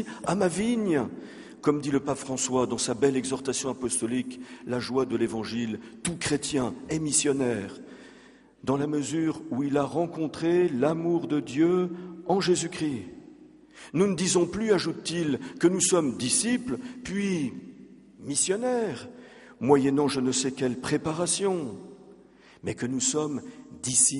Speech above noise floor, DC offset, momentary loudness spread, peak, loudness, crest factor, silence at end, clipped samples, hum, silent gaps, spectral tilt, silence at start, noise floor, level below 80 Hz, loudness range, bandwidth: 27 dB; under 0.1%; 12 LU; -6 dBFS; -27 LUFS; 22 dB; 0 s; under 0.1%; none; none; -4 dB/octave; 0 s; -54 dBFS; -60 dBFS; 3 LU; 11.5 kHz